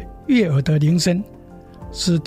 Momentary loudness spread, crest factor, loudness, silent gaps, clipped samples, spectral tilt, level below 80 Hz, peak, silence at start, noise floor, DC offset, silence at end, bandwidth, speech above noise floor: 18 LU; 14 dB; -18 LUFS; none; under 0.1%; -6 dB/octave; -42 dBFS; -6 dBFS; 0 s; -39 dBFS; under 0.1%; 0 s; 15 kHz; 22 dB